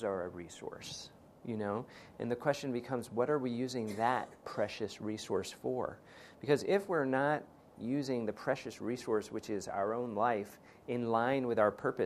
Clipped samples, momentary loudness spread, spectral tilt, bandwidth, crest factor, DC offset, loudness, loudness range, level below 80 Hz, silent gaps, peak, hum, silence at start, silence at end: under 0.1%; 14 LU; -5.5 dB/octave; 14 kHz; 20 dB; under 0.1%; -36 LUFS; 3 LU; -72 dBFS; none; -16 dBFS; none; 0 s; 0 s